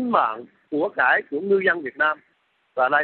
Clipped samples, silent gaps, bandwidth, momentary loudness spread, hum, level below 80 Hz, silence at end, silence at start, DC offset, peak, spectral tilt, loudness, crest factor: under 0.1%; none; 4.3 kHz; 13 LU; none; -72 dBFS; 0 s; 0 s; under 0.1%; -4 dBFS; -9 dB/octave; -22 LUFS; 18 dB